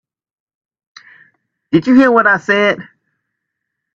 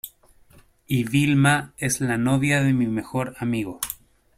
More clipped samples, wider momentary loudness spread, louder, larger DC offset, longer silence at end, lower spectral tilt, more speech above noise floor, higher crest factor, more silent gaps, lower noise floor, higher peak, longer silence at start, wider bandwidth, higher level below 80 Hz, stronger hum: neither; second, 8 LU vs 11 LU; first, -12 LUFS vs -22 LUFS; neither; first, 1.15 s vs 0.45 s; first, -6.5 dB/octave vs -5 dB/octave; first, 65 dB vs 32 dB; about the same, 16 dB vs 18 dB; neither; first, -76 dBFS vs -54 dBFS; first, 0 dBFS vs -6 dBFS; first, 1.7 s vs 0.05 s; second, 7.4 kHz vs 16 kHz; second, -60 dBFS vs -54 dBFS; neither